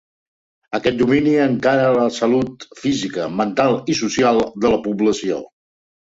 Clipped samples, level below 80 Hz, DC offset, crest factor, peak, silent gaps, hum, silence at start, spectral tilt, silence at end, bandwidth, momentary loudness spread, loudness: under 0.1%; -50 dBFS; under 0.1%; 16 dB; -2 dBFS; none; none; 0.7 s; -5.5 dB/octave; 0.7 s; 8 kHz; 8 LU; -18 LUFS